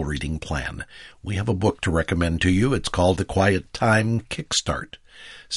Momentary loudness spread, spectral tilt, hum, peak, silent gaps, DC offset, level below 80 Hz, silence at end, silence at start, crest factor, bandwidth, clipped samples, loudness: 17 LU; -5 dB/octave; none; -4 dBFS; none; under 0.1%; -38 dBFS; 0 s; 0 s; 18 dB; 11.5 kHz; under 0.1%; -23 LUFS